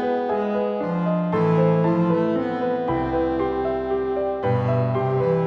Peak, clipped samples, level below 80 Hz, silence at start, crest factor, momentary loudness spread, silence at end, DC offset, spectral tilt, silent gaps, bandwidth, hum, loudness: -8 dBFS; under 0.1%; -46 dBFS; 0 s; 14 dB; 5 LU; 0 s; under 0.1%; -10 dB/octave; none; 5.8 kHz; none; -22 LUFS